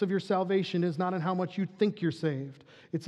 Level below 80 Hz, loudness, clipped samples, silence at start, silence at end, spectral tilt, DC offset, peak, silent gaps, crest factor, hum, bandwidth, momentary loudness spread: -82 dBFS; -31 LUFS; under 0.1%; 0 s; 0 s; -7.5 dB/octave; under 0.1%; -14 dBFS; none; 18 dB; none; 10 kHz; 8 LU